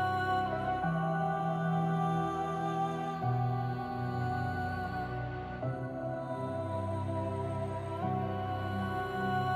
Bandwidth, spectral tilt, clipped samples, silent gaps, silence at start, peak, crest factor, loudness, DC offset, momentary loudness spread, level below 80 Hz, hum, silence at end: 12.5 kHz; -8 dB/octave; under 0.1%; none; 0 s; -22 dBFS; 12 dB; -34 LUFS; under 0.1%; 6 LU; -56 dBFS; none; 0 s